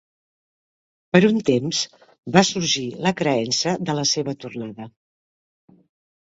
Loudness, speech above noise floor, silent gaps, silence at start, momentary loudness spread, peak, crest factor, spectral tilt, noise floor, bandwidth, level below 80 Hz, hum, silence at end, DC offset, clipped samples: -20 LUFS; over 69 dB; 2.18-2.23 s; 1.15 s; 16 LU; 0 dBFS; 22 dB; -4 dB/octave; under -90 dBFS; 8 kHz; -60 dBFS; none; 1.5 s; under 0.1%; under 0.1%